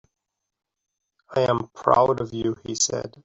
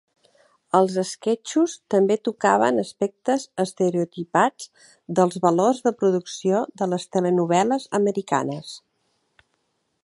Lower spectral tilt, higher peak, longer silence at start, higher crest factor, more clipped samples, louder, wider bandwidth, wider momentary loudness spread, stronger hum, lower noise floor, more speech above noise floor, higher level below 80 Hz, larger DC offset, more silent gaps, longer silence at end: second, -4 dB/octave vs -5.5 dB/octave; about the same, -2 dBFS vs -4 dBFS; first, 1.3 s vs 0.75 s; about the same, 22 dB vs 20 dB; neither; about the same, -23 LUFS vs -22 LUFS; second, 8.2 kHz vs 11.5 kHz; about the same, 9 LU vs 8 LU; neither; first, -83 dBFS vs -72 dBFS; first, 60 dB vs 50 dB; first, -58 dBFS vs -74 dBFS; neither; neither; second, 0.15 s vs 1.25 s